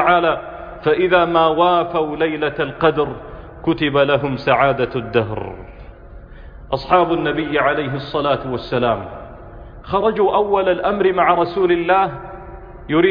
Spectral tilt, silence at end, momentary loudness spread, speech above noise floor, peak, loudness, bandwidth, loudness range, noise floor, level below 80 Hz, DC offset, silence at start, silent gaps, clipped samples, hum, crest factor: -8.5 dB/octave; 0 s; 18 LU; 21 dB; -2 dBFS; -17 LUFS; 5.2 kHz; 3 LU; -37 dBFS; -40 dBFS; under 0.1%; 0 s; none; under 0.1%; none; 16 dB